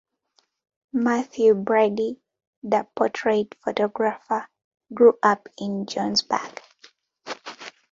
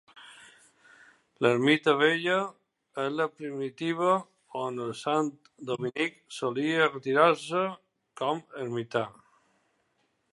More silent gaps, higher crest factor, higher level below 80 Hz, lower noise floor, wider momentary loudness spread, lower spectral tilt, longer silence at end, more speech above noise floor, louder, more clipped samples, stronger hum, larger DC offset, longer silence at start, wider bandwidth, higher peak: first, 2.47-2.62 s, 4.64-4.71 s vs none; about the same, 20 dB vs 24 dB; first, -70 dBFS vs -80 dBFS; second, -68 dBFS vs -74 dBFS; first, 20 LU vs 13 LU; about the same, -4.5 dB/octave vs -5 dB/octave; second, 0.25 s vs 1.2 s; about the same, 46 dB vs 46 dB; first, -23 LUFS vs -28 LUFS; neither; neither; neither; first, 0.95 s vs 0.15 s; second, 7.6 kHz vs 11.5 kHz; about the same, -4 dBFS vs -6 dBFS